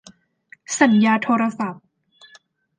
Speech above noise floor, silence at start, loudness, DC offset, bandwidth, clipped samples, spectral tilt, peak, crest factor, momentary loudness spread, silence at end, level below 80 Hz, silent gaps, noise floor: 36 dB; 0.7 s; -19 LUFS; under 0.1%; 9.8 kHz; under 0.1%; -4.5 dB/octave; -2 dBFS; 20 dB; 13 LU; 1.05 s; -72 dBFS; none; -54 dBFS